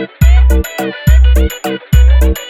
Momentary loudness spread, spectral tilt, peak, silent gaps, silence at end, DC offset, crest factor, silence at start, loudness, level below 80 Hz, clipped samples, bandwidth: 8 LU; -6 dB/octave; 0 dBFS; none; 0 s; under 0.1%; 8 dB; 0 s; -11 LUFS; -8 dBFS; 0.2%; 14.5 kHz